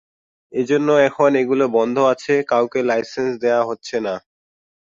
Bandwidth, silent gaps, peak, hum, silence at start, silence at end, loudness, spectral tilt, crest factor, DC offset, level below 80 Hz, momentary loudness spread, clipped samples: 7.6 kHz; none; -2 dBFS; none; 0.55 s; 0.75 s; -18 LUFS; -5.5 dB/octave; 16 dB; under 0.1%; -64 dBFS; 9 LU; under 0.1%